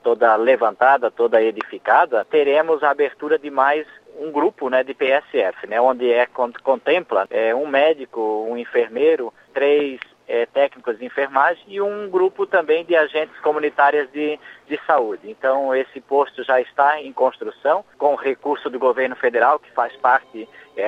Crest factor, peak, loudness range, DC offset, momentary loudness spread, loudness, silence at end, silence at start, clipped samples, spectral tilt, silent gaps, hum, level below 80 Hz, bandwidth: 18 dB; -2 dBFS; 3 LU; under 0.1%; 8 LU; -19 LUFS; 0 s; 0.05 s; under 0.1%; -5.5 dB/octave; none; none; -72 dBFS; 5.6 kHz